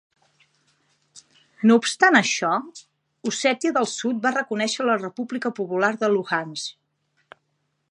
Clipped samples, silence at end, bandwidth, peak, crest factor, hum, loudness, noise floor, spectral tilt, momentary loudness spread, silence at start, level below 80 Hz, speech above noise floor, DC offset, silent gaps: under 0.1%; 1.2 s; 11 kHz; -2 dBFS; 22 dB; none; -22 LUFS; -73 dBFS; -3.5 dB/octave; 13 LU; 1.15 s; -78 dBFS; 51 dB; under 0.1%; none